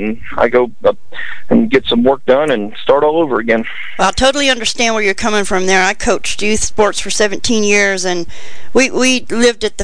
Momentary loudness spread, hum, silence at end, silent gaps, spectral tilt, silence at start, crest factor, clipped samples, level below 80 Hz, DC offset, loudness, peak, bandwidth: 6 LU; none; 0 s; none; -3 dB/octave; 0 s; 14 dB; under 0.1%; -36 dBFS; 10%; -13 LUFS; 0 dBFS; 10 kHz